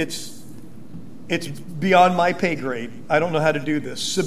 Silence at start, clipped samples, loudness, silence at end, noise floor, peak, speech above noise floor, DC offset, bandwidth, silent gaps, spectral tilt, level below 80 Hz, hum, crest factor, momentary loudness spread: 0 s; under 0.1%; -21 LUFS; 0 s; -41 dBFS; -2 dBFS; 21 dB; 2%; 15 kHz; none; -4.5 dB/octave; -58 dBFS; none; 20 dB; 25 LU